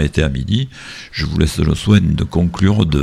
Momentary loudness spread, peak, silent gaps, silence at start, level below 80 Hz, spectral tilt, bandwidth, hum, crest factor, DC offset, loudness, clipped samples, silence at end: 11 LU; 0 dBFS; none; 0 s; -26 dBFS; -6.5 dB/octave; 14 kHz; none; 14 dB; under 0.1%; -16 LUFS; under 0.1%; 0 s